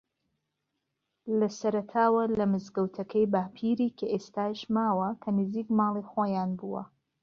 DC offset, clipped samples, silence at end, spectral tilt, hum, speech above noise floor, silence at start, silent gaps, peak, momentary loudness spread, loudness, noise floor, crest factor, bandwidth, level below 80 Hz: under 0.1%; under 0.1%; 0.35 s; -7.5 dB/octave; none; 54 dB; 1.25 s; none; -12 dBFS; 7 LU; -29 LUFS; -82 dBFS; 18 dB; 7 kHz; -68 dBFS